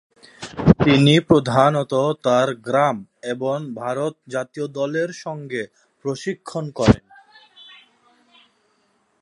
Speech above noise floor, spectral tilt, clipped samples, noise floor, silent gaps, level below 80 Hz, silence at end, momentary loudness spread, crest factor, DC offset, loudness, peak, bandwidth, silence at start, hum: 45 dB; -6.5 dB/octave; under 0.1%; -65 dBFS; none; -42 dBFS; 2.2 s; 15 LU; 20 dB; under 0.1%; -20 LUFS; 0 dBFS; 11.5 kHz; 0.4 s; none